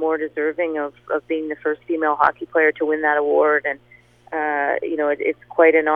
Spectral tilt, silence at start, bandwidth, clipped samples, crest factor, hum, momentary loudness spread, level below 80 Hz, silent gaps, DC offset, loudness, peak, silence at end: -7 dB/octave; 0 s; 4.1 kHz; under 0.1%; 20 dB; 60 Hz at -55 dBFS; 9 LU; -64 dBFS; none; under 0.1%; -20 LUFS; 0 dBFS; 0 s